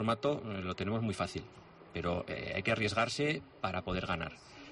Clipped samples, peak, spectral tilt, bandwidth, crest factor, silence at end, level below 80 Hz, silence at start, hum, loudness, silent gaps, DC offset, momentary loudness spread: under 0.1%; -20 dBFS; -5.5 dB/octave; 11.5 kHz; 16 dB; 0 s; -58 dBFS; 0 s; none; -36 LUFS; none; under 0.1%; 13 LU